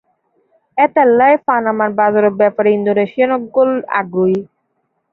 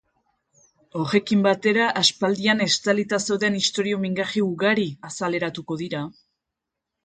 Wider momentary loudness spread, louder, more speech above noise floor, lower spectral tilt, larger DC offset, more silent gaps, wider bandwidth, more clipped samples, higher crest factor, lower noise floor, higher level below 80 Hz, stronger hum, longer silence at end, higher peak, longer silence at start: second, 6 LU vs 10 LU; first, -14 LUFS vs -22 LUFS; second, 54 dB vs 62 dB; first, -9.5 dB/octave vs -4 dB/octave; neither; neither; second, 4.2 kHz vs 9.4 kHz; neither; second, 12 dB vs 20 dB; second, -67 dBFS vs -84 dBFS; about the same, -62 dBFS vs -64 dBFS; neither; second, 0.7 s vs 0.95 s; about the same, -2 dBFS vs -4 dBFS; second, 0.75 s vs 0.95 s